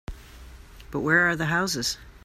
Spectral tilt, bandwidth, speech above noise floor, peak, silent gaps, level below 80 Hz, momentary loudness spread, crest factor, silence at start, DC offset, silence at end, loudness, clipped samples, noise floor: -3.5 dB/octave; 15.5 kHz; 21 dB; -6 dBFS; none; -46 dBFS; 13 LU; 20 dB; 0.1 s; under 0.1%; 0.05 s; -24 LUFS; under 0.1%; -45 dBFS